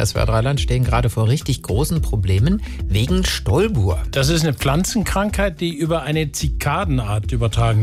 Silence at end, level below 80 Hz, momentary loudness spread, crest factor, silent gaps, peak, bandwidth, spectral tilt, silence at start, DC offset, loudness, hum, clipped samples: 0 s; -26 dBFS; 4 LU; 12 dB; none; -6 dBFS; 16 kHz; -5.5 dB/octave; 0 s; under 0.1%; -19 LUFS; none; under 0.1%